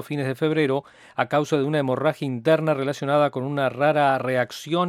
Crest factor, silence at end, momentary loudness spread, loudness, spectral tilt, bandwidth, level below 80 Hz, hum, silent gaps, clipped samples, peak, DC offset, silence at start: 18 dB; 0 s; 5 LU; -23 LUFS; -6.5 dB/octave; 15 kHz; -70 dBFS; none; none; under 0.1%; -4 dBFS; under 0.1%; 0 s